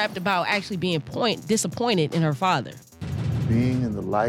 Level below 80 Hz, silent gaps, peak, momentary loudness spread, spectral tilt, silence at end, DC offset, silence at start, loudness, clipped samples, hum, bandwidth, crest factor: -50 dBFS; none; -8 dBFS; 6 LU; -5 dB/octave; 0 s; under 0.1%; 0 s; -24 LUFS; under 0.1%; none; 16.5 kHz; 16 dB